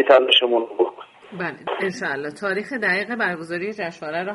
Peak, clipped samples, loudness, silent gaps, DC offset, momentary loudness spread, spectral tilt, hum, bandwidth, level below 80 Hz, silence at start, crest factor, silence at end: 0 dBFS; under 0.1%; -21 LUFS; none; under 0.1%; 13 LU; -4 dB/octave; none; 11.5 kHz; -70 dBFS; 0 s; 22 dB; 0 s